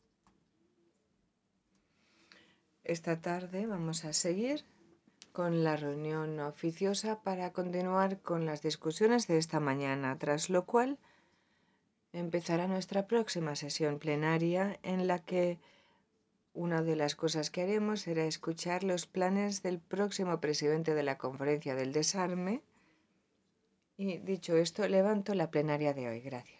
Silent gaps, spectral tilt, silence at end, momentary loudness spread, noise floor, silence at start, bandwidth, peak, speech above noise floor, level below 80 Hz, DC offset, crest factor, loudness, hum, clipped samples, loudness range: none; -5 dB/octave; 0.15 s; 7 LU; -78 dBFS; 2.85 s; 8 kHz; -16 dBFS; 45 dB; -80 dBFS; under 0.1%; 20 dB; -34 LUFS; none; under 0.1%; 4 LU